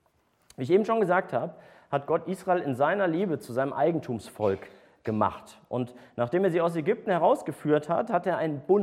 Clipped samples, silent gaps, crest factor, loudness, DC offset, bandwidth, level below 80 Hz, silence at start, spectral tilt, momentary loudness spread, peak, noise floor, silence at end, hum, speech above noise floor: under 0.1%; none; 18 dB; -27 LUFS; under 0.1%; 14.5 kHz; -70 dBFS; 0.6 s; -7.5 dB/octave; 10 LU; -10 dBFS; -68 dBFS; 0 s; none; 41 dB